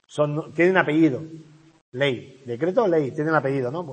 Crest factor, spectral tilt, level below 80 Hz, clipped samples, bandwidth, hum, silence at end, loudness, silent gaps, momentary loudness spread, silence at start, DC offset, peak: 22 dB; -7 dB/octave; -68 dBFS; under 0.1%; 8.8 kHz; none; 0 s; -22 LUFS; 1.81-1.92 s; 15 LU; 0.1 s; under 0.1%; -2 dBFS